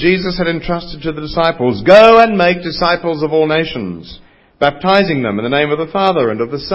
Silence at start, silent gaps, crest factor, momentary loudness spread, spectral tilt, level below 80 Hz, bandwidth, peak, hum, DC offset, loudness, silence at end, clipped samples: 0 s; none; 12 dB; 14 LU; -7 dB/octave; -40 dBFS; 8 kHz; 0 dBFS; none; under 0.1%; -13 LUFS; 0 s; 0.5%